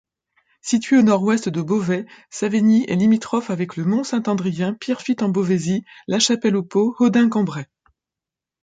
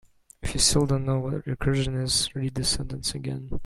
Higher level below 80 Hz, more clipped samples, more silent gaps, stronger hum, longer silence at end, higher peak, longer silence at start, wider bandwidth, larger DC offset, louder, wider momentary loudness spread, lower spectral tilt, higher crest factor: second, -64 dBFS vs -38 dBFS; neither; neither; neither; first, 1 s vs 0 s; about the same, -4 dBFS vs -6 dBFS; first, 0.65 s vs 0.4 s; second, 9.2 kHz vs 15 kHz; neither; first, -19 LUFS vs -25 LUFS; second, 9 LU vs 12 LU; first, -5.5 dB/octave vs -4 dB/octave; about the same, 16 dB vs 20 dB